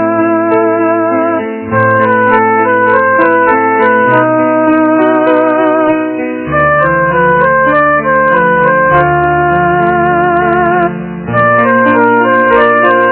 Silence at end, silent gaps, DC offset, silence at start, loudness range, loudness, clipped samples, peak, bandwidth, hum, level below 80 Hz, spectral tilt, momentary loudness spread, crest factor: 0 s; none; under 0.1%; 0 s; 1 LU; -9 LUFS; 0.5%; 0 dBFS; 4 kHz; none; -38 dBFS; -10.5 dB/octave; 4 LU; 8 dB